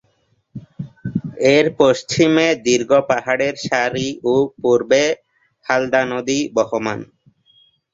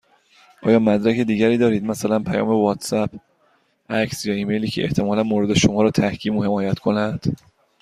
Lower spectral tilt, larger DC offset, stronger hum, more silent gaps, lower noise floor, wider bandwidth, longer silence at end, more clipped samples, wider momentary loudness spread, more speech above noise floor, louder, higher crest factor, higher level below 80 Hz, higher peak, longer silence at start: second, -4.5 dB/octave vs -6 dB/octave; neither; neither; neither; about the same, -63 dBFS vs -62 dBFS; second, 7.8 kHz vs 15 kHz; first, 0.9 s vs 0.45 s; neither; first, 15 LU vs 7 LU; about the same, 46 dB vs 43 dB; first, -17 LUFS vs -20 LUFS; about the same, 16 dB vs 18 dB; second, -56 dBFS vs -50 dBFS; about the same, -2 dBFS vs -2 dBFS; about the same, 0.55 s vs 0.6 s